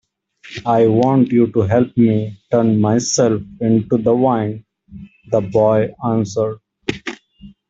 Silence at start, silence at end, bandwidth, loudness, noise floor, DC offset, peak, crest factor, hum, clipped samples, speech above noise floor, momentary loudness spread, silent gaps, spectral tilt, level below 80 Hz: 0.45 s; 0.2 s; 8 kHz; -16 LUFS; -45 dBFS; under 0.1%; -2 dBFS; 14 dB; none; under 0.1%; 30 dB; 12 LU; none; -6.5 dB/octave; -52 dBFS